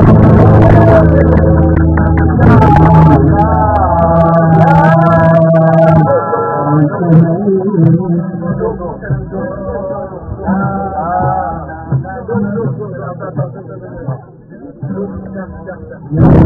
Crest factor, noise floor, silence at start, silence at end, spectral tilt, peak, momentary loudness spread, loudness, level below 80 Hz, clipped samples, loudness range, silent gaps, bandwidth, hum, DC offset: 10 dB; -32 dBFS; 0 s; 0 s; -11 dB/octave; 0 dBFS; 17 LU; -9 LUFS; -22 dBFS; 2%; 13 LU; none; 4.1 kHz; none; under 0.1%